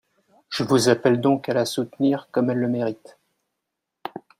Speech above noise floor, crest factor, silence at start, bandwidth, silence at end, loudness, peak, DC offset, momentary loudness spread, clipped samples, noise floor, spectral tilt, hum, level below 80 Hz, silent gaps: 60 dB; 20 dB; 0.5 s; 16 kHz; 0.2 s; -22 LUFS; -4 dBFS; under 0.1%; 19 LU; under 0.1%; -82 dBFS; -5.5 dB/octave; none; -64 dBFS; none